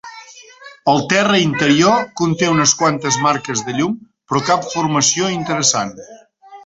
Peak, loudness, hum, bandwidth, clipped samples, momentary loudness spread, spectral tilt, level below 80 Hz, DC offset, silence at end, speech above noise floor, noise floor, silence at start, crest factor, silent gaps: 0 dBFS; -15 LUFS; none; 8.2 kHz; under 0.1%; 8 LU; -3.5 dB/octave; -54 dBFS; under 0.1%; 0.05 s; 25 dB; -40 dBFS; 0.05 s; 16 dB; none